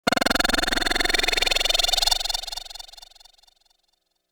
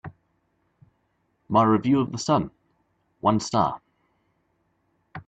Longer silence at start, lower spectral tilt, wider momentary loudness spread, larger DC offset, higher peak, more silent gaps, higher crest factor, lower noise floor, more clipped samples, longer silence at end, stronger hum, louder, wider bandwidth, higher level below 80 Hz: about the same, 0.05 s vs 0.05 s; second, -1 dB/octave vs -6 dB/octave; second, 15 LU vs 20 LU; neither; about the same, -6 dBFS vs -6 dBFS; neither; about the same, 20 dB vs 20 dB; about the same, -72 dBFS vs -71 dBFS; neither; first, 1.35 s vs 0.05 s; neither; about the same, -21 LUFS vs -23 LUFS; first, over 20 kHz vs 9 kHz; first, -36 dBFS vs -60 dBFS